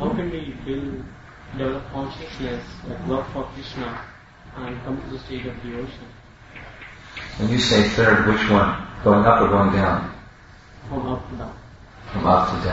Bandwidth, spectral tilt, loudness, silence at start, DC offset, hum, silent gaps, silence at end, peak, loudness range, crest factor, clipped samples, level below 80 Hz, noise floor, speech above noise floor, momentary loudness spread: 8 kHz; -6 dB/octave; -21 LUFS; 0 s; under 0.1%; none; none; 0 s; -2 dBFS; 15 LU; 22 dB; under 0.1%; -40 dBFS; -45 dBFS; 24 dB; 23 LU